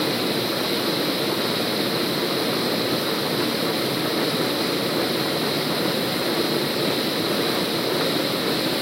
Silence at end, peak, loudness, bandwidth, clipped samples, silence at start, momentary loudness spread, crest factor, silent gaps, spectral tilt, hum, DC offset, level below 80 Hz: 0 s; -10 dBFS; -22 LUFS; 16 kHz; under 0.1%; 0 s; 1 LU; 14 dB; none; -3.5 dB/octave; none; under 0.1%; -60 dBFS